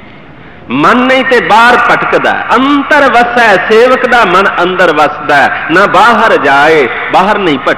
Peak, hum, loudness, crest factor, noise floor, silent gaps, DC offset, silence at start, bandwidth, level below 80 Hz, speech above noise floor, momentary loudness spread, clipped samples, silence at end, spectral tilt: 0 dBFS; none; -6 LUFS; 6 dB; -31 dBFS; none; 1%; 0.45 s; 14 kHz; -40 dBFS; 25 dB; 4 LU; 3%; 0 s; -4.5 dB/octave